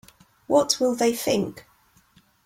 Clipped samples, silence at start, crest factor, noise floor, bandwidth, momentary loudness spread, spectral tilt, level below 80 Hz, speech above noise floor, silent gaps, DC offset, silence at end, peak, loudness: under 0.1%; 0.5 s; 20 dB; -59 dBFS; 16.5 kHz; 6 LU; -3.5 dB/octave; -62 dBFS; 37 dB; none; under 0.1%; 0.85 s; -6 dBFS; -23 LUFS